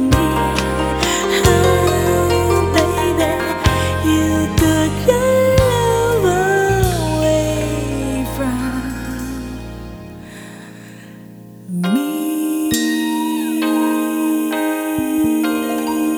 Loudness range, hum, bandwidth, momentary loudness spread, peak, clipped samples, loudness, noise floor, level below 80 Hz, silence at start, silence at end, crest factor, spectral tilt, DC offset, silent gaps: 10 LU; none; over 20 kHz; 17 LU; 0 dBFS; under 0.1%; -17 LUFS; -37 dBFS; -30 dBFS; 0 s; 0 s; 16 dB; -5 dB/octave; under 0.1%; none